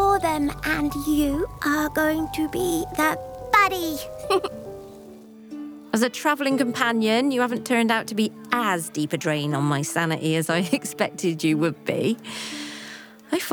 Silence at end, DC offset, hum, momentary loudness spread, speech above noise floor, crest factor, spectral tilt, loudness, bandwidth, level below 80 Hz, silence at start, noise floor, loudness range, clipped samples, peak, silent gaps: 0 s; under 0.1%; none; 12 LU; 20 dB; 20 dB; -4.5 dB/octave; -23 LUFS; over 20 kHz; -48 dBFS; 0 s; -44 dBFS; 2 LU; under 0.1%; -4 dBFS; none